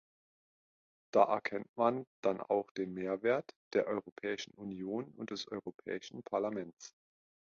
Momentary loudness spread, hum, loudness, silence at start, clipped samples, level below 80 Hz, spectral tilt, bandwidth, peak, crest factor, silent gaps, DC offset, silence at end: 12 LU; none; -37 LUFS; 1.15 s; under 0.1%; -78 dBFS; -4 dB/octave; 7.4 kHz; -12 dBFS; 26 dB; 1.69-1.74 s, 2.07-2.23 s, 2.71-2.75 s, 3.56-3.71 s, 4.12-4.16 s, 5.74-5.79 s, 6.73-6.77 s; under 0.1%; 0.65 s